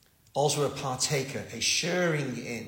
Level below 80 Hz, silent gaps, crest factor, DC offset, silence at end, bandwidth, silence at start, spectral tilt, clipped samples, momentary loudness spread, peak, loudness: -64 dBFS; none; 16 dB; under 0.1%; 0 s; 16.5 kHz; 0.35 s; -3 dB/octave; under 0.1%; 8 LU; -12 dBFS; -28 LUFS